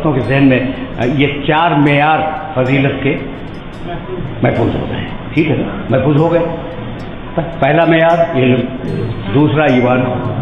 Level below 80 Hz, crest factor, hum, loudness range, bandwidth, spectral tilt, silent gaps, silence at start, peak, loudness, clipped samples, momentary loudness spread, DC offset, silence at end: -32 dBFS; 12 dB; none; 4 LU; 6.6 kHz; -8.5 dB/octave; none; 0 s; 0 dBFS; -13 LUFS; under 0.1%; 13 LU; under 0.1%; 0 s